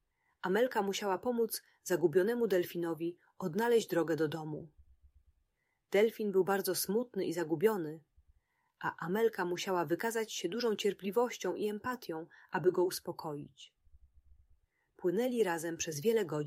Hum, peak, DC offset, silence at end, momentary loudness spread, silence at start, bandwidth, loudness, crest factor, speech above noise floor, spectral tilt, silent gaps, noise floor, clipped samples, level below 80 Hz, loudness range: none; -16 dBFS; under 0.1%; 0 s; 11 LU; 0.45 s; 16 kHz; -34 LUFS; 18 dB; 47 dB; -4.5 dB/octave; none; -81 dBFS; under 0.1%; -74 dBFS; 4 LU